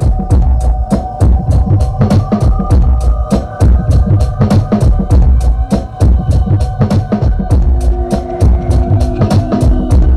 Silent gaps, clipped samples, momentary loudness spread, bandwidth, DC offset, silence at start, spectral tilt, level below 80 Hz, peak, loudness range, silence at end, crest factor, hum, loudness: none; under 0.1%; 3 LU; 11 kHz; under 0.1%; 0 s; -8.5 dB/octave; -12 dBFS; 0 dBFS; 1 LU; 0 s; 8 dB; none; -12 LUFS